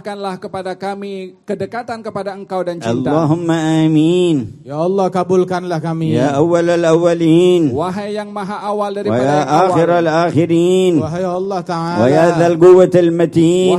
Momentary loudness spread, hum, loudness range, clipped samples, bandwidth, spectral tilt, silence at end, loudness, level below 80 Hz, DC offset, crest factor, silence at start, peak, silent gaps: 13 LU; none; 5 LU; under 0.1%; 11.5 kHz; -7 dB/octave; 0 s; -14 LUFS; -52 dBFS; under 0.1%; 14 dB; 0.05 s; 0 dBFS; none